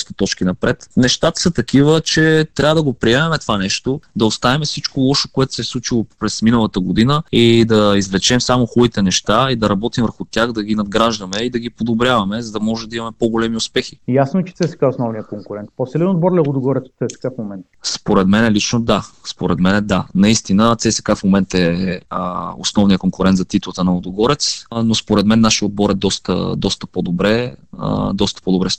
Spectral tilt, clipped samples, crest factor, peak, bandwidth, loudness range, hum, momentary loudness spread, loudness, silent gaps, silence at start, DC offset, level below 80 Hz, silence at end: -5 dB/octave; under 0.1%; 16 dB; 0 dBFS; 10 kHz; 4 LU; none; 9 LU; -16 LUFS; none; 0 s; 0.3%; -40 dBFS; 0 s